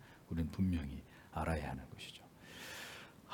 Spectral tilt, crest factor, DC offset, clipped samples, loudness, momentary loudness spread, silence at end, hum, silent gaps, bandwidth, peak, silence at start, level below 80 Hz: -6 dB/octave; 18 dB; under 0.1%; under 0.1%; -43 LUFS; 15 LU; 0 s; none; none; 18 kHz; -24 dBFS; 0 s; -54 dBFS